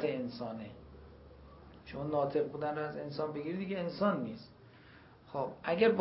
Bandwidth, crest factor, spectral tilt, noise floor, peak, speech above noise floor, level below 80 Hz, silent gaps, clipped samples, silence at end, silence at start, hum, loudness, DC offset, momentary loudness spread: 5.6 kHz; 22 dB; -5 dB/octave; -58 dBFS; -16 dBFS; 23 dB; -64 dBFS; none; under 0.1%; 0 s; 0 s; none; -36 LUFS; under 0.1%; 23 LU